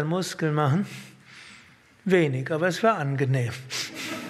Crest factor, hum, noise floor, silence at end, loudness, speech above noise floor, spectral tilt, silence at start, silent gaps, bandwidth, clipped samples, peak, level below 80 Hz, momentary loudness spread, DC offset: 20 dB; none; -53 dBFS; 0 s; -25 LUFS; 29 dB; -6 dB/octave; 0 s; none; 14.5 kHz; under 0.1%; -6 dBFS; -70 dBFS; 21 LU; under 0.1%